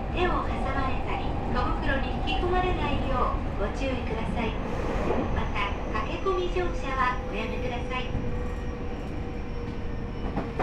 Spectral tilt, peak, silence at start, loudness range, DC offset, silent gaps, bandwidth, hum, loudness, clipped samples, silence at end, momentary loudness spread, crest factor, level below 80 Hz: -7 dB/octave; -12 dBFS; 0 s; 3 LU; under 0.1%; none; 9 kHz; none; -30 LUFS; under 0.1%; 0 s; 8 LU; 16 dB; -32 dBFS